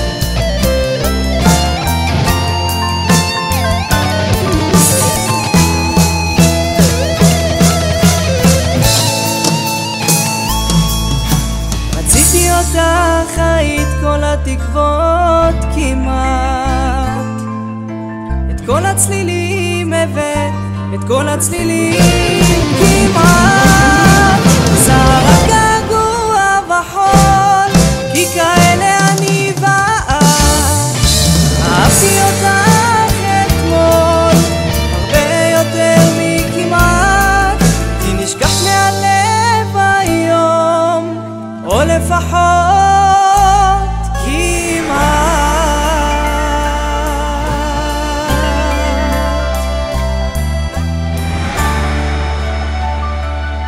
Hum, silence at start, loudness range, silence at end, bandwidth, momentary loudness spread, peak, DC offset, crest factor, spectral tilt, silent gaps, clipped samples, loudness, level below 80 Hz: none; 0 s; 7 LU; 0 s; 16.5 kHz; 9 LU; 0 dBFS; under 0.1%; 12 dB; -4.5 dB/octave; none; under 0.1%; -11 LUFS; -20 dBFS